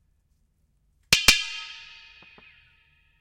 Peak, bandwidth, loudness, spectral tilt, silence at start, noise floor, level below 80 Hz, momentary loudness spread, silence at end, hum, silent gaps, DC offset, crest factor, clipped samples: 0 dBFS; 16 kHz; -20 LUFS; 0 dB/octave; 1.1 s; -68 dBFS; -46 dBFS; 22 LU; 1.35 s; none; none; under 0.1%; 28 dB; under 0.1%